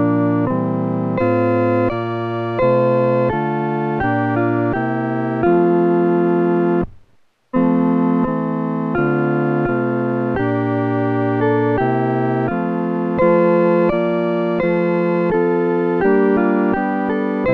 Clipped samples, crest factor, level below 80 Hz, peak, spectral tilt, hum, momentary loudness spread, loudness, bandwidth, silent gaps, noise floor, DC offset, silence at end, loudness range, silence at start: under 0.1%; 14 dB; -46 dBFS; -2 dBFS; -10.5 dB/octave; none; 5 LU; -17 LUFS; 5 kHz; none; -55 dBFS; under 0.1%; 0 s; 2 LU; 0 s